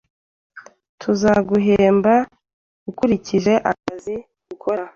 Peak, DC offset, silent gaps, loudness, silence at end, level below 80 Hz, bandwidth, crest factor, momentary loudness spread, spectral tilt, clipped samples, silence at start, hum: -4 dBFS; under 0.1%; 0.89-0.98 s, 2.53-2.86 s; -18 LUFS; 0.05 s; -50 dBFS; 7.4 kHz; 16 dB; 16 LU; -6.5 dB/octave; under 0.1%; 0.55 s; none